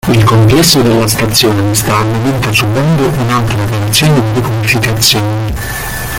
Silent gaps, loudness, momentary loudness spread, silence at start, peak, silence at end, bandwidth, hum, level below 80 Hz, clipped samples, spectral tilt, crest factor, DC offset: none; -10 LUFS; 7 LU; 0.05 s; 0 dBFS; 0 s; 17.5 kHz; none; -28 dBFS; 0.1%; -4.5 dB/octave; 10 dB; under 0.1%